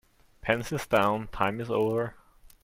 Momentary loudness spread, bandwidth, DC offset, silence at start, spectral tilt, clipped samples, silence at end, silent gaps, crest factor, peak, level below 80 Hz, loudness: 7 LU; 16.5 kHz; under 0.1%; 0.45 s; -5.5 dB/octave; under 0.1%; 0.5 s; none; 22 dB; -8 dBFS; -52 dBFS; -28 LUFS